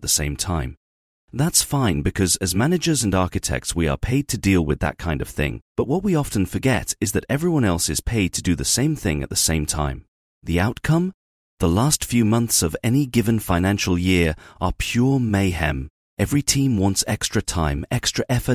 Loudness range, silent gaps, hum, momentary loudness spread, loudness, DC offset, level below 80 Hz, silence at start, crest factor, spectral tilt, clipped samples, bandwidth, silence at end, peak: 2 LU; 0.77-1.28 s, 5.62-5.75 s, 10.08-10.41 s, 11.14-11.57 s, 15.90-16.17 s; none; 7 LU; -21 LUFS; under 0.1%; -34 dBFS; 0 s; 18 dB; -4.5 dB/octave; under 0.1%; 18.5 kHz; 0 s; -2 dBFS